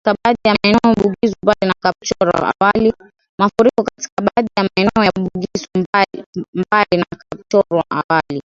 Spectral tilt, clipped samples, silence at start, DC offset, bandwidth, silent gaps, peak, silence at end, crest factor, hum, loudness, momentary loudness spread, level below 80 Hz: -5.5 dB/octave; under 0.1%; 0.05 s; under 0.1%; 7.8 kHz; 3.29-3.38 s, 4.12-4.17 s, 5.86-5.93 s, 6.26-6.33 s, 6.48-6.53 s, 8.04-8.09 s; 0 dBFS; 0.05 s; 16 dB; none; -16 LUFS; 9 LU; -46 dBFS